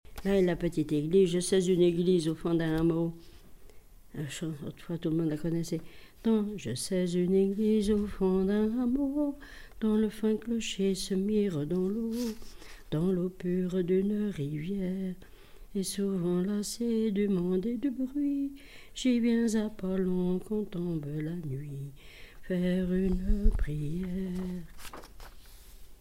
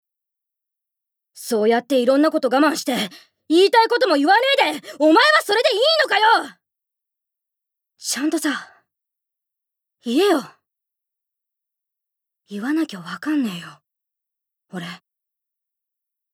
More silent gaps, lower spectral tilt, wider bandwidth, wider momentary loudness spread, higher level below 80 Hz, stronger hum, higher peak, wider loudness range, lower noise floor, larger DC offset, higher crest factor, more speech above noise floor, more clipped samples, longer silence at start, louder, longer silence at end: neither; first, -6.5 dB/octave vs -3 dB/octave; second, 16 kHz vs 18 kHz; second, 12 LU vs 18 LU; first, -42 dBFS vs -84 dBFS; neither; second, -12 dBFS vs -4 dBFS; second, 5 LU vs 12 LU; second, -51 dBFS vs -84 dBFS; first, 0.1% vs under 0.1%; about the same, 18 dB vs 18 dB; second, 22 dB vs 66 dB; neither; second, 0.1 s vs 1.35 s; second, -30 LUFS vs -18 LUFS; second, 0.05 s vs 1.4 s